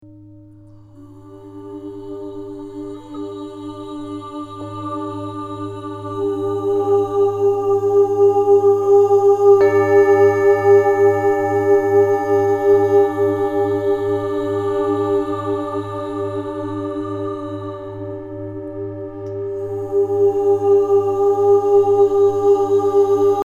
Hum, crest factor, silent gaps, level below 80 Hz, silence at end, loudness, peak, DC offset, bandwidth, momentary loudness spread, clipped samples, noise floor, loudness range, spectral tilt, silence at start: none; 14 dB; none; -52 dBFS; 0 s; -16 LUFS; -2 dBFS; under 0.1%; 7.4 kHz; 18 LU; under 0.1%; -42 dBFS; 16 LU; -7.5 dB/octave; 0.05 s